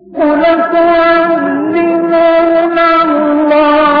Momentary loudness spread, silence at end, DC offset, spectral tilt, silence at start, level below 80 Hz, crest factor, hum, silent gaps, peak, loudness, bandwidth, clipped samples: 4 LU; 0 s; under 0.1%; -7.5 dB/octave; 0.1 s; -44 dBFS; 8 dB; none; none; 0 dBFS; -9 LUFS; 5.2 kHz; under 0.1%